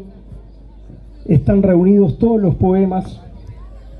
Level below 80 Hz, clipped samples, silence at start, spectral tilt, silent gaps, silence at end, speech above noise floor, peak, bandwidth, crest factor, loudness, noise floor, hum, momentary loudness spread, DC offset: -34 dBFS; under 0.1%; 0 s; -11.5 dB/octave; none; 0 s; 25 dB; -2 dBFS; 4.4 kHz; 14 dB; -14 LUFS; -38 dBFS; none; 19 LU; under 0.1%